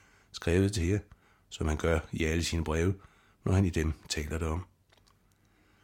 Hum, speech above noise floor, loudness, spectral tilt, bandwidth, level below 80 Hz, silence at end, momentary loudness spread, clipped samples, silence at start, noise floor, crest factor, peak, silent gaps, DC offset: none; 37 dB; -31 LUFS; -5.5 dB/octave; 16 kHz; -42 dBFS; 1.2 s; 11 LU; under 0.1%; 0.35 s; -67 dBFS; 18 dB; -14 dBFS; none; under 0.1%